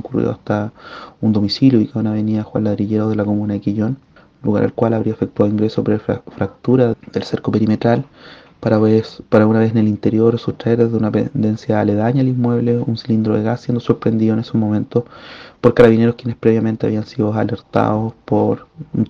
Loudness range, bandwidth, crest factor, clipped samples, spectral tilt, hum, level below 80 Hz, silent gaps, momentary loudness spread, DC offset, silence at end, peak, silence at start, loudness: 3 LU; 7 kHz; 16 dB; under 0.1%; -9 dB/octave; none; -50 dBFS; none; 9 LU; under 0.1%; 0 s; 0 dBFS; 0.05 s; -17 LUFS